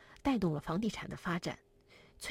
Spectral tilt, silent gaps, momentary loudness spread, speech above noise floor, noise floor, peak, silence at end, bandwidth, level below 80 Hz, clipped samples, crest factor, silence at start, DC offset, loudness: -6 dB/octave; none; 11 LU; 27 dB; -62 dBFS; -20 dBFS; 0 s; 16 kHz; -58 dBFS; under 0.1%; 18 dB; 0 s; under 0.1%; -37 LUFS